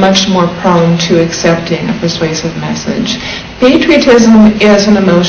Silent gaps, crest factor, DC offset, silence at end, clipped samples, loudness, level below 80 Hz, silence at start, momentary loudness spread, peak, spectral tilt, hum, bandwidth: none; 8 dB; under 0.1%; 0 s; 2%; -8 LUFS; -34 dBFS; 0 s; 10 LU; 0 dBFS; -5 dB/octave; none; 8 kHz